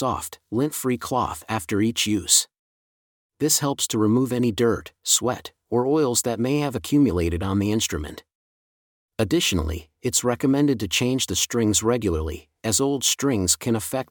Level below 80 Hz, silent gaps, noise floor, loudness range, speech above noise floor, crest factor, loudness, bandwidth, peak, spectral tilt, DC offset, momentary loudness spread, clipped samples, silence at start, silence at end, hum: -46 dBFS; 2.59-3.30 s, 8.35-9.09 s; under -90 dBFS; 3 LU; over 67 dB; 18 dB; -22 LUFS; 19 kHz; -4 dBFS; -4 dB/octave; under 0.1%; 8 LU; under 0.1%; 0 s; 0.05 s; none